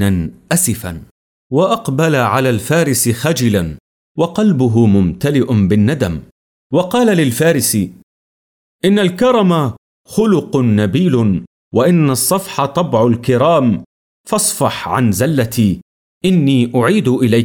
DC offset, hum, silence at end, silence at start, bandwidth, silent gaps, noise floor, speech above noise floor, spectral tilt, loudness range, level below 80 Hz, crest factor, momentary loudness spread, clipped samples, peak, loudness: under 0.1%; none; 0 s; 0 s; 19.5 kHz; 1.11-1.50 s, 3.80-4.15 s, 6.32-6.70 s, 8.03-8.79 s, 9.78-10.05 s, 11.47-11.71 s, 13.86-14.24 s, 15.82-16.21 s; under -90 dBFS; over 77 dB; -5.5 dB/octave; 2 LU; -46 dBFS; 12 dB; 8 LU; under 0.1%; -2 dBFS; -14 LUFS